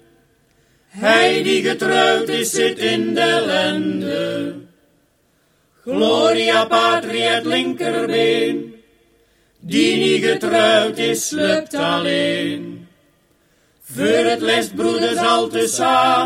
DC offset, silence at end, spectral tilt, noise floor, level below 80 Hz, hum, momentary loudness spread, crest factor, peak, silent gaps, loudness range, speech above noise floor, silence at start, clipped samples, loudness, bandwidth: under 0.1%; 0 s; -3.5 dB/octave; -60 dBFS; -60 dBFS; none; 8 LU; 18 dB; 0 dBFS; none; 4 LU; 43 dB; 0.95 s; under 0.1%; -17 LUFS; 16 kHz